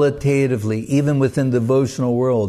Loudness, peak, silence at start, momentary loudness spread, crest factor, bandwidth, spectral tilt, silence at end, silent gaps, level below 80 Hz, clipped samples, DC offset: -18 LUFS; -6 dBFS; 0 s; 3 LU; 12 dB; 13 kHz; -7.5 dB/octave; 0 s; none; -48 dBFS; under 0.1%; under 0.1%